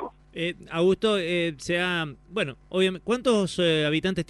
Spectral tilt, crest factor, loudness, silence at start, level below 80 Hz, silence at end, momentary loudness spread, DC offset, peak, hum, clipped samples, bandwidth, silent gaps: -5 dB/octave; 16 dB; -25 LUFS; 0 s; -54 dBFS; 0.05 s; 9 LU; under 0.1%; -10 dBFS; none; under 0.1%; 11.5 kHz; none